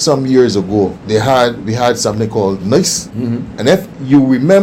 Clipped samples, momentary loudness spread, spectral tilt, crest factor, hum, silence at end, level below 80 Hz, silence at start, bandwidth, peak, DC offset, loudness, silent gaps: under 0.1%; 6 LU; -5 dB/octave; 12 dB; none; 0 s; -44 dBFS; 0 s; 16.5 kHz; 0 dBFS; under 0.1%; -13 LUFS; none